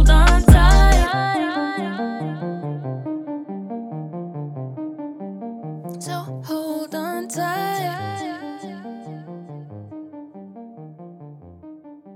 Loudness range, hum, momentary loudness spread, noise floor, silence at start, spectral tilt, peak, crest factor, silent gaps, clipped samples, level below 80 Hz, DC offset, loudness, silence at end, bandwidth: 16 LU; none; 26 LU; -41 dBFS; 0 s; -6 dB/octave; 0 dBFS; 20 dB; none; under 0.1%; -22 dBFS; under 0.1%; -22 LUFS; 0 s; 15.5 kHz